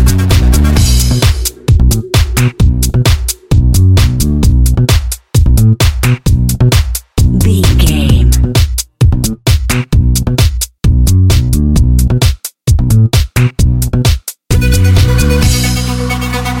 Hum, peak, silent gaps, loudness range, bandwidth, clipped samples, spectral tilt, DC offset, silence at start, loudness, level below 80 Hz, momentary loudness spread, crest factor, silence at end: none; 0 dBFS; none; 1 LU; 17 kHz; 0.2%; -5 dB/octave; under 0.1%; 0 s; -10 LUFS; -12 dBFS; 5 LU; 8 dB; 0 s